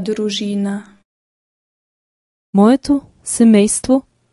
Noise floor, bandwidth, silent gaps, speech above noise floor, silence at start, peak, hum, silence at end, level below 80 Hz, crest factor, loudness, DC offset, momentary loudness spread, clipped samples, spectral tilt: under -90 dBFS; 11.5 kHz; 1.05-2.53 s; over 76 dB; 0 s; 0 dBFS; none; 0.3 s; -50 dBFS; 16 dB; -15 LUFS; under 0.1%; 11 LU; under 0.1%; -5 dB/octave